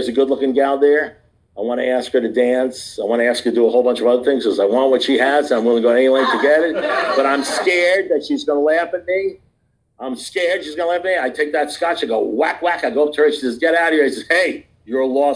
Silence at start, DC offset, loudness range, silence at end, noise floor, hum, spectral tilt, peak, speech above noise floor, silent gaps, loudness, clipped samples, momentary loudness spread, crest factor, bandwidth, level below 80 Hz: 0 s; under 0.1%; 5 LU; 0 s; -63 dBFS; none; -3.5 dB/octave; -4 dBFS; 47 dB; none; -17 LUFS; under 0.1%; 7 LU; 14 dB; 10.5 kHz; -60 dBFS